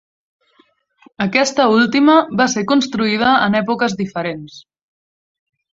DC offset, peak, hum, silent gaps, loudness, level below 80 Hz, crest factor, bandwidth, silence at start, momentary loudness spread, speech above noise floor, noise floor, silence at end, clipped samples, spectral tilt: under 0.1%; -2 dBFS; none; none; -15 LUFS; -58 dBFS; 16 dB; 8 kHz; 1.2 s; 10 LU; 42 dB; -57 dBFS; 1.15 s; under 0.1%; -4.5 dB/octave